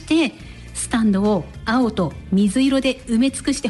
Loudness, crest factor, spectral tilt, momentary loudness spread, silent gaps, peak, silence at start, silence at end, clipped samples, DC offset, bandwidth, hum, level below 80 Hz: -20 LUFS; 10 dB; -5 dB/octave; 7 LU; none; -8 dBFS; 0 s; 0 s; under 0.1%; under 0.1%; 11.5 kHz; none; -40 dBFS